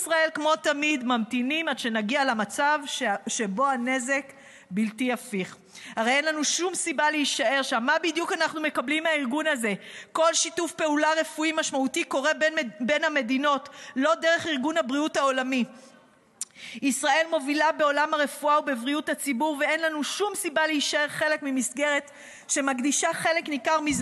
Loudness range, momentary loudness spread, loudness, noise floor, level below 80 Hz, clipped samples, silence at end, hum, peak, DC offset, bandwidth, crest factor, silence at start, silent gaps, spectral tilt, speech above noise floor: 2 LU; 6 LU; -25 LUFS; -57 dBFS; -70 dBFS; under 0.1%; 0 s; none; -10 dBFS; under 0.1%; 13 kHz; 16 dB; 0 s; none; -2 dB/octave; 31 dB